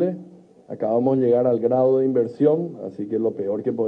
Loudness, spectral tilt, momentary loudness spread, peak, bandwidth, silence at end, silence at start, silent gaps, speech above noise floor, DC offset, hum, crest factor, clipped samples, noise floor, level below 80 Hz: -21 LUFS; -11 dB/octave; 12 LU; -6 dBFS; 4.9 kHz; 0 s; 0 s; none; 25 dB; under 0.1%; none; 14 dB; under 0.1%; -45 dBFS; -72 dBFS